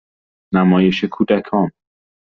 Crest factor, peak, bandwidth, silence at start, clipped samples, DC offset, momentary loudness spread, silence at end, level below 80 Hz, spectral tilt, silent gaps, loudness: 14 dB; -2 dBFS; 6.4 kHz; 0.5 s; under 0.1%; under 0.1%; 7 LU; 0.6 s; -54 dBFS; -6 dB/octave; none; -17 LUFS